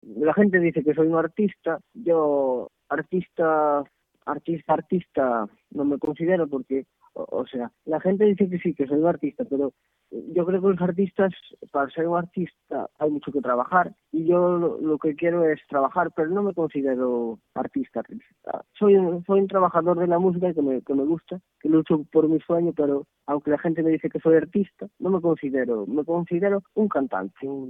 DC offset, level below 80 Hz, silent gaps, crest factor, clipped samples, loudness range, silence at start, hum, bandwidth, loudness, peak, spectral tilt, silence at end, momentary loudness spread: under 0.1%; -66 dBFS; none; 18 dB; under 0.1%; 3 LU; 0.05 s; none; 3.8 kHz; -24 LUFS; -6 dBFS; -10.5 dB/octave; 0 s; 11 LU